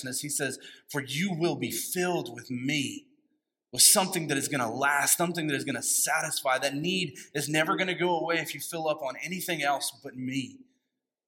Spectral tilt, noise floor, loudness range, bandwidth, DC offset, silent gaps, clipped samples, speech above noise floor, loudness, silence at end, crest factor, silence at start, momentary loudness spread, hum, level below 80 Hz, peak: -2.5 dB/octave; -83 dBFS; 7 LU; 17 kHz; under 0.1%; none; under 0.1%; 54 dB; -27 LUFS; 0.7 s; 24 dB; 0 s; 11 LU; none; -78 dBFS; -6 dBFS